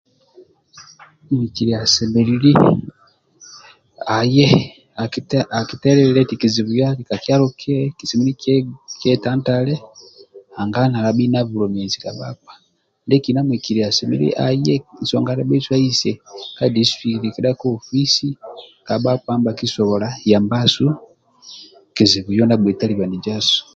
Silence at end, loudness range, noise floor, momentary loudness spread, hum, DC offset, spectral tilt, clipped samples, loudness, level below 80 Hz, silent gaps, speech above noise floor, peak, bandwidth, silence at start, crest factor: 0.15 s; 3 LU; -56 dBFS; 14 LU; none; under 0.1%; -5.5 dB/octave; under 0.1%; -17 LUFS; -52 dBFS; none; 39 dB; 0 dBFS; 7.8 kHz; 0.4 s; 18 dB